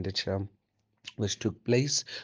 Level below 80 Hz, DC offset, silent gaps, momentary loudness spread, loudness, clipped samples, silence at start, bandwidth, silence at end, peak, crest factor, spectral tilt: -66 dBFS; under 0.1%; none; 18 LU; -30 LUFS; under 0.1%; 0 s; 10 kHz; 0 s; -12 dBFS; 20 dB; -4 dB/octave